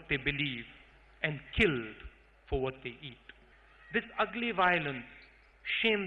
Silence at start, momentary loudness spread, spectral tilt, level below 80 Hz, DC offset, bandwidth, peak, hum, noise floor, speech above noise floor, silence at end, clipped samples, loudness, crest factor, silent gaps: 0 s; 19 LU; -6.5 dB/octave; -52 dBFS; under 0.1%; 9.8 kHz; -12 dBFS; none; -60 dBFS; 27 dB; 0 s; under 0.1%; -33 LUFS; 22 dB; none